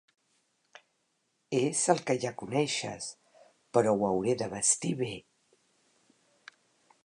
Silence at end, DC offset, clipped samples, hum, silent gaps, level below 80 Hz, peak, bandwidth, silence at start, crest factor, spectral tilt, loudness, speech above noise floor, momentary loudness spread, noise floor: 1.85 s; under 0.1%; under 0.1%; none; none; -70 dBFS; -8 dBFS; 11 kHz; 1.5 s; 24 dB; -4 dB/octave; -30 LUFS; 47 dB; 11 LU; -77 dBFS